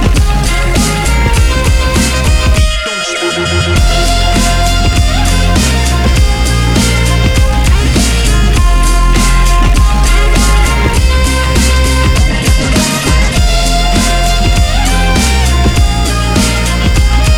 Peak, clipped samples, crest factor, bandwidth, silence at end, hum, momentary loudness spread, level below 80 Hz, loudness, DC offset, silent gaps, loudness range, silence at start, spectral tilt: 0 dBFS; under 0.1%; 8 dB; 16.5 kHz; 0 s; none; 1 LU; -10 dBFS; -10 LUFS; under 0.1%; none; 1 LU; 0 s; -4 dB/octave